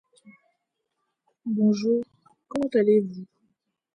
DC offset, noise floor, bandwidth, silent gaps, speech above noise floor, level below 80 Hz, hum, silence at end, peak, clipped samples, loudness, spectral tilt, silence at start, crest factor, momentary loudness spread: under 0.1%; -79 dBFS; 9.2 kHz; none; 57 dB; -70 dBFS; none; 0.7 s; -10 dBFS; under 0.1%; -24 LUFS; -7.5 dB/octave; 0.25 s; 16 dB; 18 LU